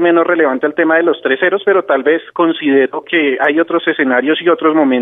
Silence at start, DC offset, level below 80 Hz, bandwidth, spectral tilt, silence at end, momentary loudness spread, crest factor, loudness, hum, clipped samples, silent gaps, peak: 0 s; under 0.1%; -68 dBFS; 3.9 kHz; -7.5 dB/octave; 0 s; 3 LU; 12 dB; -13 LUFS; none; under 0.1%; none; 0 dBFS